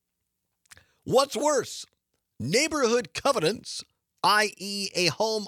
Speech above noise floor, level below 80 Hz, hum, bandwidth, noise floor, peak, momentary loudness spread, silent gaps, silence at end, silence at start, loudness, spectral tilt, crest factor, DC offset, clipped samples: 55 dB; -66 dBFS; none; 17 kHz; -81 dBFS; -6 dBFS; 14 LU; none; 0 s; 1.05 s; -25 LUFS; -3 dB/octave; 20 dB; under 0.1%; under 0.1%